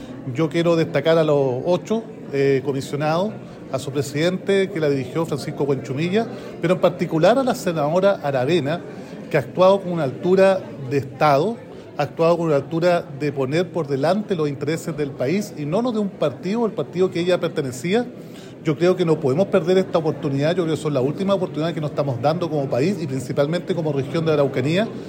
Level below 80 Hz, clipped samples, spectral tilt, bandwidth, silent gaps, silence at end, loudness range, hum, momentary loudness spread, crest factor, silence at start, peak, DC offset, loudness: -60 dBFS; under 0.1%; -6.5 dB/octave; 16 kHz; none; 0 s; 3 LU; none; 8 LU; 16 dB; 0 s; -4 dBFS; under 0.1%; -21 LUFS